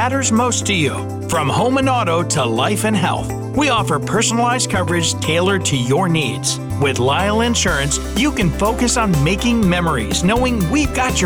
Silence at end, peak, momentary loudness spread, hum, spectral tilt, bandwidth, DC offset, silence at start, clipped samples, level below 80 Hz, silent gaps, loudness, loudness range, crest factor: 0 s; -6 dBFS; 3 LU; none; -4 dB/octave; over 20 kHz; under 0.1%; 0 s; under 0.1%; -30 dBFS; none; -16 LUFS; 1 LU; 10 dB